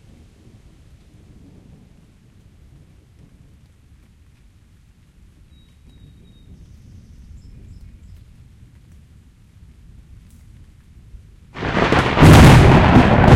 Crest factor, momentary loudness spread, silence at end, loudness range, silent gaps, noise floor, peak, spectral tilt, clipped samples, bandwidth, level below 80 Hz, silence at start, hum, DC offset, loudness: 18 dB; 18 LU; 0 s; 17 LU; none; -50 dBFS; 0 dBFS; -6.5 dB/octave; under 0.1%; 16 kHz; -28 dBFS; 11.55 s; none; under 0.1%; -11 LUFS